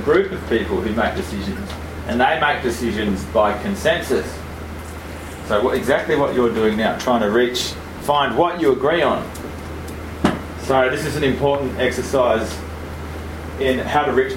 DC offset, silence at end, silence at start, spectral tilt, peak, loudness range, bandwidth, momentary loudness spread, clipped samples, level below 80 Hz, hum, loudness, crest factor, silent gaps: under 0.1%; 0 s; 0 s; -5 dB/octave; 0 dBFS; 3 LU; 16.5 kHz; 13 LU; under 0.1%; -36 dBFS; none; -19 LUFS; 20 dB; none